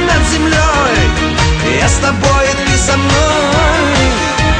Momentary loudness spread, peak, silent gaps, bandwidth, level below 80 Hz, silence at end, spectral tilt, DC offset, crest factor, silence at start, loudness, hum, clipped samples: 2 LU; 0 dBFS; none; 10 kHz; -18 dBFS; 0 s; -4 dB/octave; under 0.1%; 10 dB; 0 s; -11 LUFS; none; under 0.1%